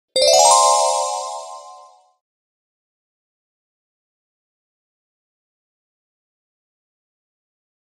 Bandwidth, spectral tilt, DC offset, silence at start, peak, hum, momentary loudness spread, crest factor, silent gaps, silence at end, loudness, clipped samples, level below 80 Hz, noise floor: 16 kHz; 2 dB/octave; under 0.1%; 0.15 s; 0 dBFS; none; 20 LU; 22 dB; none; 6.2 s; -13 LUFS; under 0.1%; -68 dBFS; -46 dBFS